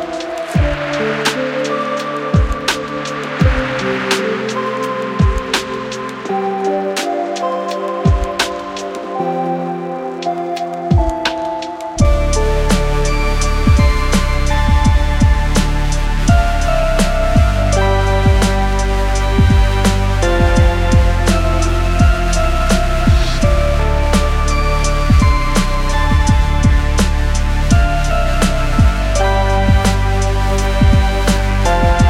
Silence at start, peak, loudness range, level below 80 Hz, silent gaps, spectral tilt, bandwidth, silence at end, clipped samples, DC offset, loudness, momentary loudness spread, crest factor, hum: 0 s; 0 dBFS; 4 LU; -16 dBFS; none; -5.5 dB/octave; 14.5 kHz; 0 s; under 0.1%; under 0.1%; -15 LUFS; 7 LU; 12 dB; none